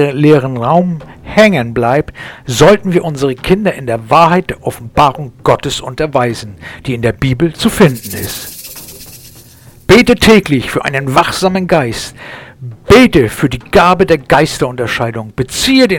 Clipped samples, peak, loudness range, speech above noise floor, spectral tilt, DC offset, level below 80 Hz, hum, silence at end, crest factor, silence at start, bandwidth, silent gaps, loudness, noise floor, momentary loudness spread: 0.4%; 0 dBFS; 4 LU; 27 dB; -5.5 dB/octave; under 0.1%; -32 dBFS; none; 0 s; 12 dB; 0 s; 19 kHz; none; -11 LUFS; -38 dBFS; 17 LU